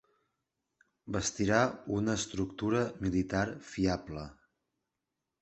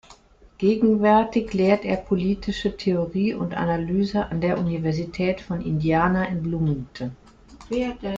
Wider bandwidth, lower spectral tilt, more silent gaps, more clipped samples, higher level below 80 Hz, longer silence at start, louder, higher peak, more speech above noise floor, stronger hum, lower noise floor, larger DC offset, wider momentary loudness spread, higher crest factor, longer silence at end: first, 8.4 kHz vs 7.6 kHz; second, -5 dB/octave vs -8 dB/octave; neither; neither; second, -54 dBFS vs -46 dBFS; first, 1.05 s vs 0.1 s; second, -32 LUFS vs -23 LUFS; second, -12 dBFS vs -6 dBFS; first, 55 dB vs 29 dB; neither; first, -87 dBFS vs -51 dBFS; neither; about the same, 9 LU vs 8 LU; first, 24 dB vs 18 dB; first, 1.1 s vs 0 s